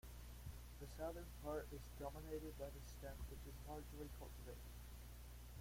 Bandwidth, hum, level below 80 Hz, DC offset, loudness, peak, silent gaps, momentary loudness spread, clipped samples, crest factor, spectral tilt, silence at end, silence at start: 16.5 kHz; 60 Hz at -55 dBFS; -56 dBFS; under 0.1%; -54 LUFS; -36 dBFS; none; 8 LU; under 0.1%; 18 dB; -5.5 dB/octave; 0 s; 0.05 s